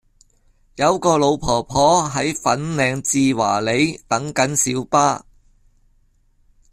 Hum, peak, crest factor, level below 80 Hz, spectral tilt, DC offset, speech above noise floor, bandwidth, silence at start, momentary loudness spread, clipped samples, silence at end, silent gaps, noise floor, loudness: none; -2 dBFS; 18 dB; -46 dBFS; -4 dB/octave; under 0.1%; 40 dB; 14.5 kHz; 0.75 s; 5 LU; under 0.1%; 1.55 s; none; -58 dBFS; -18 LUFS